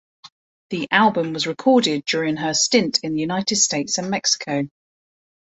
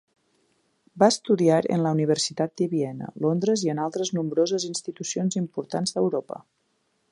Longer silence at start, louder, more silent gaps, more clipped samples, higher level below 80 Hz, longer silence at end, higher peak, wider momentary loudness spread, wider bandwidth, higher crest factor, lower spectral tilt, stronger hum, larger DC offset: second, 0.25 s vs 0.95 s; first, -19 LUFS vs -25 LUFS; first, 0.32-0.69 s vs none; neither; first, -64 dBFS vs -72 dBFS; first, 0.9 s vs 0.7 s; about the same, -2 dBFS vs -4 dBFS; about the same, 8 LU vs 10 LU; second, 8.4 kHz vs 11.5 kHz; about the same, 20 dB vs 22 dB; second, -2.5 dB/octave vs -5 dB/octave; neither; neither